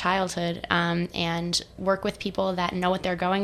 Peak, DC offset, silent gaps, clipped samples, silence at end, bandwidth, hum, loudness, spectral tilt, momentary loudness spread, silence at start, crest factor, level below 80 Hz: -6 dBFS; under 0.1%; none; under 0.1%; 0 s; 13.5 kHz; none; -26 LUFS; -4.5 dB/octave; 3 LU; 0 s; 22 dB; -50 dBFS